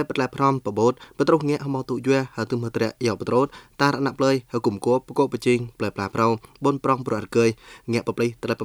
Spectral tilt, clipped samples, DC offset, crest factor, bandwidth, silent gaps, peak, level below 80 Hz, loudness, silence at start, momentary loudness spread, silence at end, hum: -6.5 dB/octave; under 0.1%; under 0.1%; 20 dB; over 20 kHz; none; -4 dBFS; -58 dBFS; -23 LUFS; 0 s; 5 LU; 0 s; none